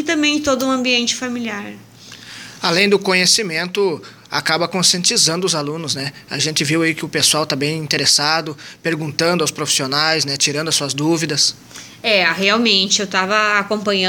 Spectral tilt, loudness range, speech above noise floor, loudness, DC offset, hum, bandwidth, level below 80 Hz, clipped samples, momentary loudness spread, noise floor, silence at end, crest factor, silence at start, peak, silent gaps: -2.5 dB/octave; 2 LU; 20 dB; -16 LUFS; under 0.1%; none; 17.5 kHz; -58 dBFS; under 0.1%; 11 LU; -37 dBFS; 0 s; 18 dB; 0 s; 0 dBFS; none